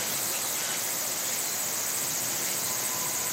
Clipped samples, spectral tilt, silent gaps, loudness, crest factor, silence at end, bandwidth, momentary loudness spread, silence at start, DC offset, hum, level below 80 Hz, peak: under 0.1%; 0 dB/octave; none; -27 LUFS; 14 dB; 0 s; 16 kHz; 1 LU; 0 s; under 0.1%; none; -72 dBFS; -16 dBFS